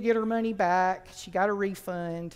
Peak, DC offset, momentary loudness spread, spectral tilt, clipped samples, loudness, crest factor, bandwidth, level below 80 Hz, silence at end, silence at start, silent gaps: -12 dBFS; under 0.1%; 9 LU; -6 dB/octave; under 0.1%; -28 LUFS; 16 dB; 16 kHz; -60 dBFS; 0 s; 0 s; none